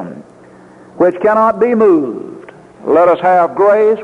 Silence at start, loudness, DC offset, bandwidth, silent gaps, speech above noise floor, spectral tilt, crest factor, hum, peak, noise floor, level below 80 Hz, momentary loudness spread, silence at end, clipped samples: 0 s; -11 LUFS; under 0.1%; 7.6 kHz; none; 29 dB; -8 dB/octave; 12 dB; none; -2 dBFS; -39 dBFS; -56 dBFS; 16 LU; 0 s; under 0.1%